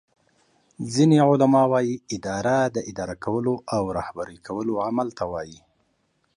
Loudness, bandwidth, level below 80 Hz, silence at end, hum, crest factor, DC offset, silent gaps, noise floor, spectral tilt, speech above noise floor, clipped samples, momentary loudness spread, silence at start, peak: -23 LUFS; 11 kHz; -56 dBFS; 0.8 s; none; 18 dB; under 0.1%; none; -69 dBFS; -6.5 dB/octave; 47 dB; under 0.1%; 15 LU; 0.8 s; -6 dBFS